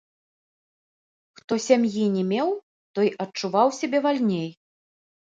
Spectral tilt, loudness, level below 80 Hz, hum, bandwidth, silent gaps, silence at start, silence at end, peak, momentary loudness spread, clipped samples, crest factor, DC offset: -5.5 dB/octave; -24 LUFS; -74 dBFS; none; 9 kHz; 2.63-2.94 s; 1.5 s; 0.7 s; -4 dBFS; 9 LU; under 0.1%; 20 dB; under 0.1%